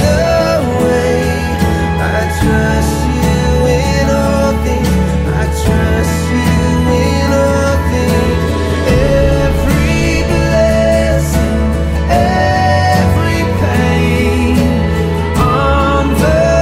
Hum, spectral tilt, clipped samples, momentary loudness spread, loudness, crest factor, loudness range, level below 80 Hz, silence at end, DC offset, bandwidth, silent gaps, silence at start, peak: none; -6 dB/octave; under 0.1%; 3 LU; -12 LUFS; 10 dB; 1 LU; -18 dBFS; 0 s; under 0.1%; 16 kHz; none; 0 s; 0 dBFS